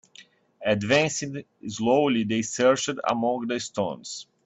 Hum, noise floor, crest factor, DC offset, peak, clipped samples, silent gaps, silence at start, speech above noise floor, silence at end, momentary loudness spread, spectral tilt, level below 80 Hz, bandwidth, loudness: none; -54 dBFS; 20 dB; under 0.1%; -6 dBFS; under 0.1%; none; 0.2 s; 29 dB; 0.25 s; 14 LU; -4 dB/octave; -64 dBFS; 8.4 kHz; -25 LUFS